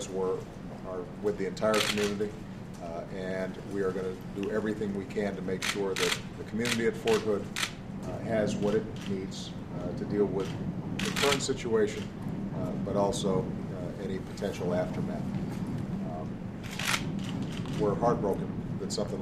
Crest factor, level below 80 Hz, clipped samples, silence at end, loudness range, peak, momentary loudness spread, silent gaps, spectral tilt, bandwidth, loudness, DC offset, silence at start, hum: 20 dB; -52 dBFS; under 0.1%; 0 s; 3 LU; -10 dBFS; 10 LU; none; -5 dB/octave; 15.5 kHz; -32 LUFS; under 0.1%; 0 s; none